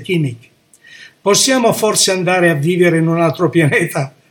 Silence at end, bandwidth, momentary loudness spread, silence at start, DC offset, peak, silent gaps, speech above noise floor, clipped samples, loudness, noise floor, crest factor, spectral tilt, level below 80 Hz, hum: 0.2 s; 18 kHz; 8 LU; 0 s; under 0.1%; 0 dBFS; none; 29 dB; under 0.1%; -13 LUFS; -43 dBFS; 14 dB; -4 dB/octave; -62 dBFS; none